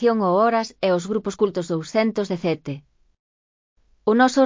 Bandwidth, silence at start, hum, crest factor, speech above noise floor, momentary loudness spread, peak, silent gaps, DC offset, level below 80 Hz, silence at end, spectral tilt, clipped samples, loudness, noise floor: 7.6 kHz; 0 s; none; 18 dB; over 70 dB; 9 LU; -4 dBFS; 3.19-3.76 s; under 0.1%; -62 dBFS; 0 s; -6 dB/octave; under 0.1%; -22 LUFS; under -90 dBFS